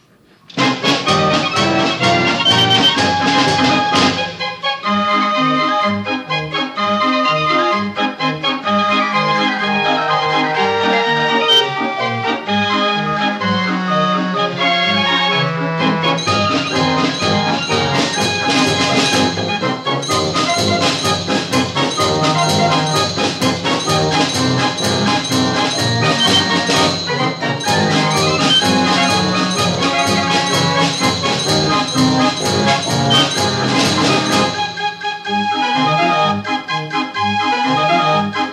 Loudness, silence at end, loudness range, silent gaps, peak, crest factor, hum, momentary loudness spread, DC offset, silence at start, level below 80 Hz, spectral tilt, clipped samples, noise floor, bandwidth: -14 LUFS; 0 s; 3 LU; none; 0 dBFS; 14 dB; none; 6 LU; under 0.1%; 0.5 s; -52 dBFS; -3.5 dB/octave; under 0.1%; -48 dBFS; 15.5 kHz